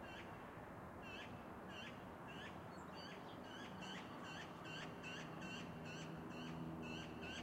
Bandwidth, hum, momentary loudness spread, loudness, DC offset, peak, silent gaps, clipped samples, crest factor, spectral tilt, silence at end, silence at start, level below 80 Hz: 16 kHz; none; 4 LU; -52 LUFS; under 0.1%; -38 dBFS; none; under 0.1%; 14 dB; -5 dB/octave; 0 s; 0 s; -72 dBFS